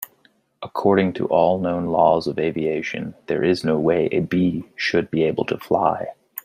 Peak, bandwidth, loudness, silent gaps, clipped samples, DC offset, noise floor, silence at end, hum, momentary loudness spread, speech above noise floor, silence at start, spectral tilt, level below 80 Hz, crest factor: -2 dBFS; 15.5 kHz; -21 LUFS; none; under 0.1%; under 0.1%; -60 dBFS; 0.05 s; none; 10 LU; 40 dB; 0 s; -7 dB/octave; -58 dBFS; 18 dB